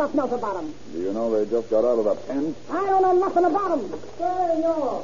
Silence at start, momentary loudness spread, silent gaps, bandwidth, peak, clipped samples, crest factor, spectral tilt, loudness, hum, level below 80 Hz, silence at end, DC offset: 0 s; 10 LU; none; 7.2 kHz; -8 dBFS; under 0.1%; 14 dB; -5.5 dB/octave; -23 LUFS; none; -56 dBFS; 0 s; 1%